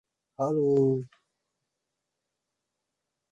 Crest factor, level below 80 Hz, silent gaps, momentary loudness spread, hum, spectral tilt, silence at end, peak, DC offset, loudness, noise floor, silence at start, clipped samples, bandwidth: 18 dB; -72 dBFS; none; 11 LU; none; -10 dB/octave; 2.25 s; -14 dBFS; under 0.1%; -27 LUFS; -85 dBFS; 0.4 s; under 0.1%; 7.6 kHz